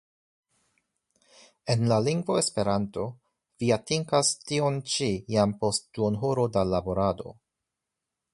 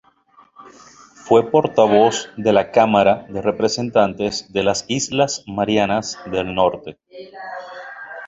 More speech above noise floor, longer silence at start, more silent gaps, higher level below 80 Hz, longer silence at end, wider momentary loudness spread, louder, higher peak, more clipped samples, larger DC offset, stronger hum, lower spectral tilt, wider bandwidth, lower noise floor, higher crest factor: first, 60 dB vs 35 dB; first, 1.65 s vs 0.6 s; neither; about the same, -54 dBFS vs -52 dBFS; first, 1 s vs 0 s; second, 8 LU vs 18 LU; second, -27 LUFS vs -18 LUFS; second, -8 dBFS vs -2 dBFS; neither; neither; neither; about the same, -5 dB/octave vs -4.5 dB/octave; first, 11.5 kHz vs 8 kHz; first, -86 dBFS vs -53 dBFS; about the same, 20 dB vs 18 dB